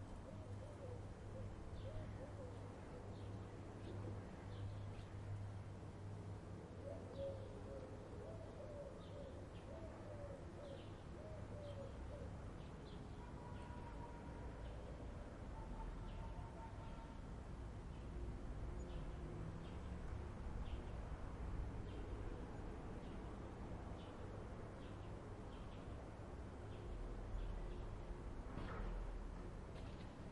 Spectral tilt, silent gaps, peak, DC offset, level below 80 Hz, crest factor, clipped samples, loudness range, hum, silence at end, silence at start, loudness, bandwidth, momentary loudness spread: -7.5 dB/octave; none; -36 dBFS; under 0.1%; -54 dBFS; 14 dB; under 0.1%; 2 LU; none; 0 s; 0 s; -53 LUFS; 11 kHz; 4 LU